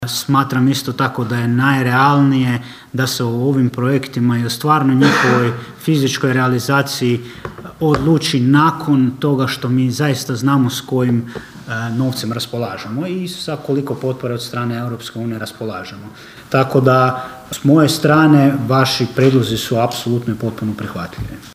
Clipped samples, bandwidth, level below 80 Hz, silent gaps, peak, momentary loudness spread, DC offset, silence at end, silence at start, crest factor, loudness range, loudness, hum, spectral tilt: under 0.1%; 16 kHz; -48 dBFS; none; 0 dBFS; 13 LU; under 0.1%; 0 s; 0 s; 16 dB; 8 LU; -16 LUFS; none; -6 dB/octave